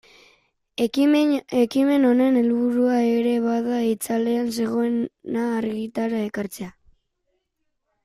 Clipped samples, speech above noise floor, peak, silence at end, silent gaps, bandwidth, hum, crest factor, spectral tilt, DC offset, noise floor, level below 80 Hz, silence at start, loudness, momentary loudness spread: under 0.1%; 54 dB; -8 dBFS; 1.35 s; none; 15 kHz; none; 14 dB; -5.5 dB/octave; under 0.1%; -75 dBFS; -64 dBFS; 0.8 s; -22 LUFS; 10 LU